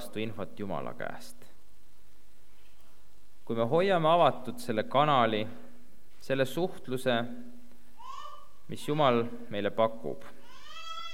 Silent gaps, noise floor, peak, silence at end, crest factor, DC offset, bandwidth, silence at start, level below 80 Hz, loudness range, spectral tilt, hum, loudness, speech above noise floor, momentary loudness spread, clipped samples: none; -62 dBFS; -10 dBFS; 0 s; 22 dB; 2%; 17 kHz; 0 s; -66 dBFS; 9 LU; -6 dB/octave; none; -30 LUFS; 33 dB; 21 LU; under 0.1%